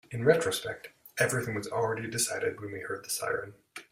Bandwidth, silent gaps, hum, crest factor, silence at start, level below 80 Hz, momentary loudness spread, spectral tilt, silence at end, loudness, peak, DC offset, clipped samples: 16 kHz; none; none; 22 dB; 0.1 s; -66 dBFS; 14 LU; -3.5 dB/octave; 0.1 s; -31 LUFS; -10 dBFS; under 0.1%; under 0.1%